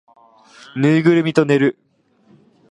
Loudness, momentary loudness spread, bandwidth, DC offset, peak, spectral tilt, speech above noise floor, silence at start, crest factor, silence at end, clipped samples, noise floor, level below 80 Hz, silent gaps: -16 LUFS; 6 LU; 10.5 kHz; under 0.1%; 0 dBFS; -7.5 dB/octave; 39 dB; 0.75 s; 18 dB; 1 s; under 0.1%; -54 dBFS; -66 dBFS; none